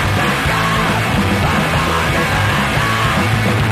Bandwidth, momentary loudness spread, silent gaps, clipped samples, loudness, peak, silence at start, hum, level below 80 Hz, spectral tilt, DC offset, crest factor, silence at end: 15.5 kHz; 1 LU; none; under 0.1%; -15 LUFS; -2 dBFS; 0 s; none; -28 dBFS; -5 dB/octave; under 0.1%; 12 dB; 0 s